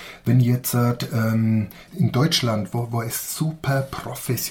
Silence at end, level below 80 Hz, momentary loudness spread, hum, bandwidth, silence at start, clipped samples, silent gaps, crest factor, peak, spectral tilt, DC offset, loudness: 0 s; -52 dBFS; 7 LU; none; 18 kHz; 0 s; under 0.1%; none; 16 dB; -6 dBFS; -5.5 dB/octave; under 0.1%; -22 LUFS